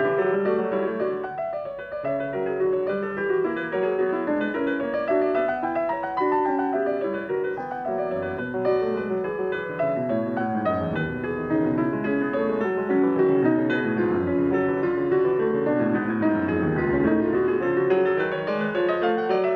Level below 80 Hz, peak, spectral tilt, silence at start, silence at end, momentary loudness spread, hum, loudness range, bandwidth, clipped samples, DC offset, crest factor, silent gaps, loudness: -54 dBFS; -8 dBFS; -9 dB/octave; 0 s; 0 s; 6 LU; none; 4 LU; 5 kHz; under 0.1%; under 0.1%; 16 dB; none; -24 LUFS